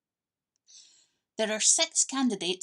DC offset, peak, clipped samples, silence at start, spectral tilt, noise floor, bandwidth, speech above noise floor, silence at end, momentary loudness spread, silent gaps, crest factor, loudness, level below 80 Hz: under 0.1%; -8 dBFS; under 0.1%; 0.75 s; -1 dB/octave; under -90 dBFS; 12.5 kHz; over 63 dB; 0.05 s; 11 LU; none; 22 dB; -25 LUFS; -90 dBFS